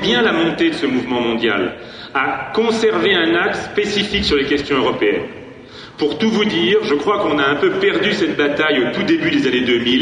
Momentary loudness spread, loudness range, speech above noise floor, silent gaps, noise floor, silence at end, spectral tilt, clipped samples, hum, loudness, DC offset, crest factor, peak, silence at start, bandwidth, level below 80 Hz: 7 LU; 2 LU; 20 dB; none; -36 dBFS; 0 s; -5 dB/octave; under 0.1%; none; -16 LUFS; under 0.1%; 14 dB; -2 dBFS; 0 s; 10 kHz; -44 dBFS